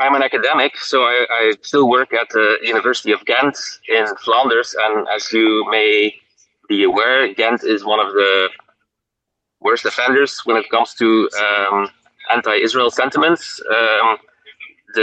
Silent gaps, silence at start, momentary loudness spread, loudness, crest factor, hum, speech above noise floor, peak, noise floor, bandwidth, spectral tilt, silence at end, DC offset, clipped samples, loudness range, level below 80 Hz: none; 0 s; 5 LU; -15 LUFS; 16 dB; none; 63 dB; 0 dBFS; -79 dBFS; 8.6 kHz; -3 dB/octave; 0 s; under 0.1%; under 0.1%; 2 LU; -68 dBFS